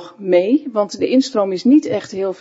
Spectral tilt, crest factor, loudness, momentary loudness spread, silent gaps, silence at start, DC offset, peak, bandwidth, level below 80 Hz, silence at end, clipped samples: -5.5 dB/octave; 14 dB; -16 LUFS; 8 LU; none; 0 s; under 0.1%; -2 dBFS; 8 kHz; -70 dBFS; 0.05 s; under 0.1%